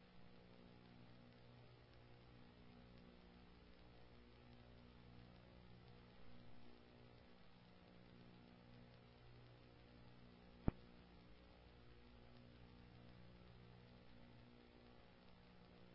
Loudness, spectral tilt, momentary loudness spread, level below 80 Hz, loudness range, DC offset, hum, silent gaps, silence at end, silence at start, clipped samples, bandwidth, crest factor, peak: -63 LUFS; -6 dB/octave; 2 LU; -66 dBFS; 9 LU; under 0.1%; 60 Hz at -70 dBFS; none; 0 s; 0 s; under 0.1%; 5.6 kHz; 38 dB; -22 dBFS